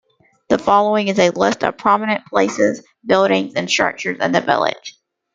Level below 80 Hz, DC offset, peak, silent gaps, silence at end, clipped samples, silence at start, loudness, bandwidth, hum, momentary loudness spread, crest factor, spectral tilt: -58 dBFS; under 0.1%; 0 dBFS; none; 0.45 s; under 0.1%; 0.5 s; -17 LUFS; 9.2 kHz; none; 6 LU; 16 dB; -4 dB/octave